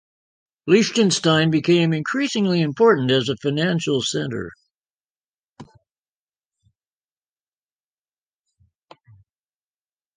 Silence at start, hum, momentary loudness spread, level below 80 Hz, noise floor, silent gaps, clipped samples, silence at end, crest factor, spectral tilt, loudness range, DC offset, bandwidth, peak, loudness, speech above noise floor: 0.65 s; none; 9 LU; -62 dBFS; under -90 dBFS; 4.75-4.85 s, 4.93-4.97 s, 5.05-5.09 s, 5.28-5.49 s; under 0.1%; 4.5 s; 20 dB; -5 dB/octave; 12 LU; under 0.1%; 10 kHz; -4 dBFS; -19 LUFS; over 71 dB